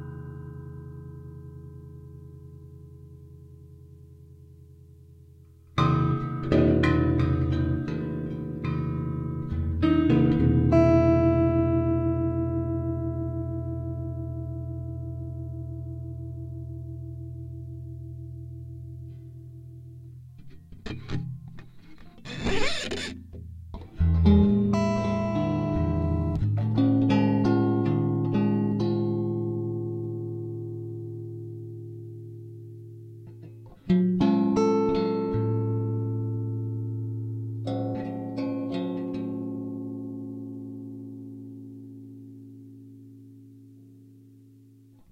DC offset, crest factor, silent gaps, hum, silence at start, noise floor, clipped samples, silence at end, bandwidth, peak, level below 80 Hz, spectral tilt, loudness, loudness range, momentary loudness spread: under 0.1%; 22 dB; none; none; 0 s; -54 dBFS; under 0.1%; 1.15 s; 9.4 kHz; -6 dBFS; -42 dBFS; -8 dB/octave; -26 LUFS; 19 LU; 23 LU